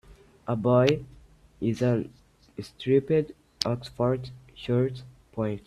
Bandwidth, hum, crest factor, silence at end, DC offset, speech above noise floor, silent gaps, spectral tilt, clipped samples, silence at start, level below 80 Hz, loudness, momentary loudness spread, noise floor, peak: 13 kHz; none; 24 dB; 0.1 s; under 0.1%; 27 dB; none; -7 dB/octave; under 0.1%; 0.1 s; -56 dBFS; -27 LUFS; 19 LU; -52 dBFS; -4 dBFS